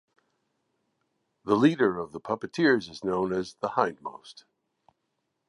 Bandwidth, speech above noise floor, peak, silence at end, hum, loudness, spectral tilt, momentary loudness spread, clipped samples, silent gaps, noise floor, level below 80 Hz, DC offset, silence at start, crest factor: 11 kHz; 53 dB; -8 dBFS; 1.15 s; none; -27 LUFS; -6.5 dB/octave; 18 LU; under 0.1%; none; -79 dBFS; -66 dBFS; under 0.1%; 1.45 s; 22 dB